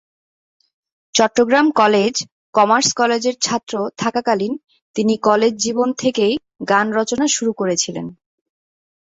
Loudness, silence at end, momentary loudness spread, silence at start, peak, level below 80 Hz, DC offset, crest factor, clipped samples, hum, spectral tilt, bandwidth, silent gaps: -17 LUFS; 0.9 s; 10 LU; 1.15 s; -2 dBFS; -60 dBFS; under 0.1%; 18 dB; under 0.1%; none; -3 dB/octave; 8 kHz; 2.32-2.53 s, 4.82-4.94 s